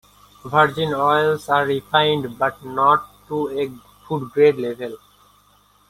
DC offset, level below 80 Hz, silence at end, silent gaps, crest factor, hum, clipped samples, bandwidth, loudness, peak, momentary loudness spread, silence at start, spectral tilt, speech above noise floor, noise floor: under 0.1%; -58 dBFS; 0.95 s; none; 18 dB; 50 Hz at -50 dBFS; under 0.1%; 16 kHz; -19 LUFS; -2 dBFS; 11 LU; 0.45 s; -5.5 dB/octave; 37 dB; -56 dBFS